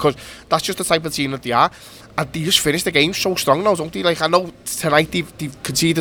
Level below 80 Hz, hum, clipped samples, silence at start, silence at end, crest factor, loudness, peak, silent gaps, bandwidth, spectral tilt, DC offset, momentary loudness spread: -48 dBFS; none; under 0.1%; 0 s; 0 s; 18 dB; -18 LUFS; 0 dBFS; none; over 20 kHz; -3.5 dB/octave; under 0.1%; 9 LU